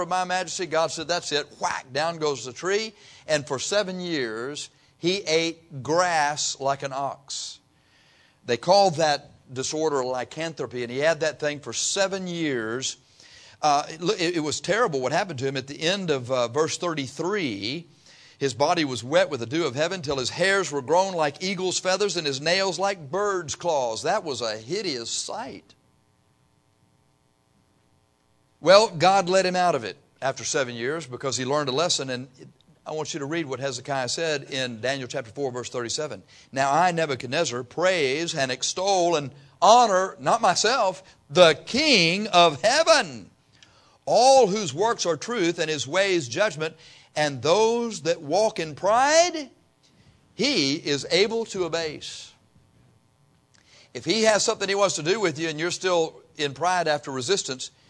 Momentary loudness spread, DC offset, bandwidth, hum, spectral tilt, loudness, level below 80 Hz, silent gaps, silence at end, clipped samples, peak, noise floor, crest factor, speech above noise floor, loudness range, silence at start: 13 LU; under 0.1%; 10.5 kHz; none; -3 dB/octave; -24 LUFS; -66 dBFS; none; 0.2 s; under 0.1%; -2 dBFS; -65 dBFS; 22 dB; 41 dB; 7 LU; 0 s